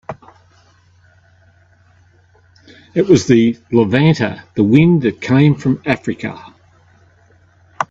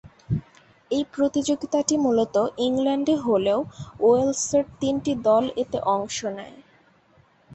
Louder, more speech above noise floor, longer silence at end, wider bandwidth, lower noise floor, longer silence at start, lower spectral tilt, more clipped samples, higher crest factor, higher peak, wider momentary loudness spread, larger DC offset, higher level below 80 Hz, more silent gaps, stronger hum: first, -14 LUFS vs -23 LUFS; about the same, 38 dB vs 36 dB; about the same, 0.05 s vs 0 s; about the same, 7.8 kHz vs 8.4 kHz; second, -51 dBFS vs -59 dBFS; about the same, 0.1 s vs 0.05 s; first, -7 dB/octave vs -5 dB/octave; neither; about the same, 16 dB vs 16 dB; first, 0 dBFS vs -8 dBFS; first, 15 LU vs 9 LU; neither; about the same, -50 dBFS vs -54 dBFS; neither; neither